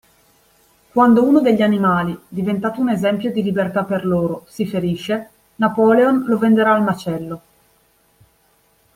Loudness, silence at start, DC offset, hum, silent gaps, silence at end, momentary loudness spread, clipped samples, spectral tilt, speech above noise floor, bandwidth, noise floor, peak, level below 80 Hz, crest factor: -17 LUFS; 0.95 s; under 0.1%; none; none; 1.6 s; 11 LU; under 0.1%; -7.5 dB/octave; 42 dB; 16 kHz; -58 dBFS; -2 dBFS; -56 dBFS; 16 dB